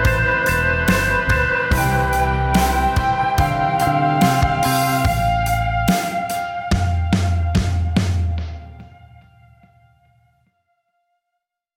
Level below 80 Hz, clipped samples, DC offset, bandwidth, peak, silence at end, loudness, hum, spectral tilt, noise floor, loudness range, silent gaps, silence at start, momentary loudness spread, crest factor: -28 dBFS; under 0.1%; under 0.1%; 17 kHz; -2 dBFS; 2.9 s; -18 LUFS; none; -5.5 dB/octave; -79 dBFS; 7 LU; none; 0 s; 6 LU; 16 dB